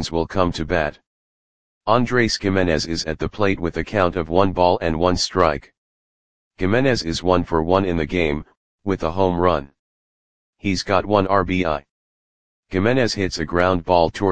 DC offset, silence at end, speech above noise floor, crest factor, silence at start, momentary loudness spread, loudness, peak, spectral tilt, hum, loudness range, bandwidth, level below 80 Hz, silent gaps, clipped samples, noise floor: 2%; 0 s; over 71 dB; 20 dB; 0 s; 8 LU; -20 LUFS; 0 dBFS; -5.5 dB/octave; none; 3 LU; 9.8 kHz; -40 dBFS; 1.07-1.81 s, 5.78-6.51 s, 8.57-8.78 s, 9.79-10.53 s, 11.90-12.63 s; under 0.1%; under -90 dBFS